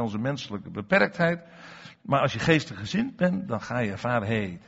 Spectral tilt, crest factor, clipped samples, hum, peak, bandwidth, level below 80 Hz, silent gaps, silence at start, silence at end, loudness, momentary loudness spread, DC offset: -5 dB/octave; 20 dB; under 0.1%; none; -8 dBFS; 8 kHz; -58 dBFS; none; 0 s; 0.1 s; -26 LUFS; 13 LU; under 0.1%